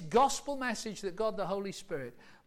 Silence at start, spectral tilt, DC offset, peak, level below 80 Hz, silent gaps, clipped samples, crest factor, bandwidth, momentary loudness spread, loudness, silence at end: 0 s; -3.5 dB/octave; under 0.1%; -18 dBFS; -58 dBFS; none; under 0.1%; 16 dB; 16.5 kHz; 13 LU; -34 LUFS; 0.1 s